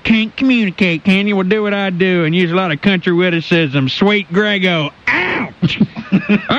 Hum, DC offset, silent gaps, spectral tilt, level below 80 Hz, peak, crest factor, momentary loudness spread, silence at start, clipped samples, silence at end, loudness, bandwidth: none; under 0.1%; none; -7 dB/octave; -48 dBFS; -2 dBFS; 12 dB; 3 LU; 0.05 s; under 0.1%; 0 s; -14 LUFS; 7.4 kHz